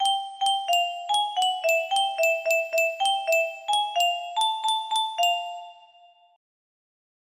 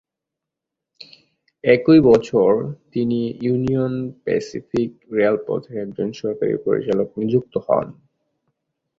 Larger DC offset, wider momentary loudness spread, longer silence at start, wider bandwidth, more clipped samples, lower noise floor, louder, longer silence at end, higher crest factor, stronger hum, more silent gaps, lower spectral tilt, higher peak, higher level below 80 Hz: neither; second, 3 LU vs 12 LU; second, 0 s vs 1 s; first, 15.5 kHz vs 7.6 kHz; neither; second, -56 dBFS vs -84 dBFS; second, -24 LUFS vs -20 LUFS; first, 1.6 s vs 1.05 s; about the same, 16 dB vs 18 dB; neither; neither; second, 3 dB/octave vs -8 dB/octave; second, -10 dBFS vs -2 dBFS; second, -80 dBFS vs -54 dBFS